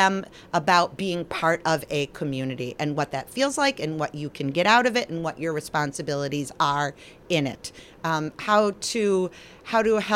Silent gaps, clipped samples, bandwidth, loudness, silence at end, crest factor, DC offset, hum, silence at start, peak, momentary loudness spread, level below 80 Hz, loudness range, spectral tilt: none; under 0.1%; 16.5 kHz; -25 LUFS; 0 s; 20 dB; under 0.1%; none; 0 s; -6 dBFS; 10 LU; -58 dBFS; 2 LU; -4.5 dB/octave